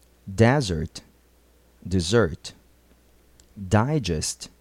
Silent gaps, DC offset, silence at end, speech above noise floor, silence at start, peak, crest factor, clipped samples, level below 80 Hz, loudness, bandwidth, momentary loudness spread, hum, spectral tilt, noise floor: none; under 0.1%; 0.15 s; 35 dB; 0.25 s; -4 dBFS; 20 dB; under 0.1%; -44 dBFS; -23 LUFS; 13.5 kHz; 21 LU; none; -5.5 dB/octave; -58 dBFS